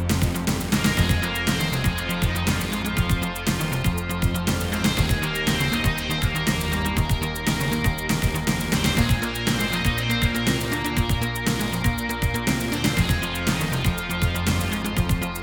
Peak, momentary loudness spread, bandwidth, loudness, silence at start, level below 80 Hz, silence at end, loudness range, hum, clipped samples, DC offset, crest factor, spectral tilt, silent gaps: -8 dBFS; 3 LU; over 20 kHz; -23 LUFS; 0 s; -32 dBFS; 0 s; 1 LU; none; under 0.1%; under 0.1%; 16 dB; -4.5 dB/octave; none